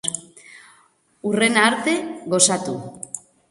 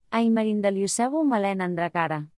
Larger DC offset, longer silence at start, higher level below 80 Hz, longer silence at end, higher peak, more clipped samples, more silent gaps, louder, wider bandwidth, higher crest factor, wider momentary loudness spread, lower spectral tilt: neither; about the same, 0.05 s vs 0.1 s; about the same, -66 dBFS vs -70 dBFS; first, 0.35 s vs 0.1 s; first, -2 dBFS vs -10 dBFS; neither; neither; first, -19 LUFS vs -24 LUFS; about the same, 11.5 kHz vs 12 kHz; first, 22 dB vs 14 dB; first, 17 LU vs 4 LU; second, -2.5 dB/octave vs -5 dB/octave